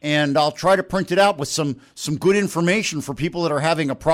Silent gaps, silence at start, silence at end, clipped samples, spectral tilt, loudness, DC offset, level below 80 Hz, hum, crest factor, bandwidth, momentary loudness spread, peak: none; 0.05 s; 0 s; under 0.1%; -4.5 dB/octave; -20 LUFS; under 0.1%; -52 dBFS; none; 14 dB; 16.5 kHz; 8 LU; -6 dBFS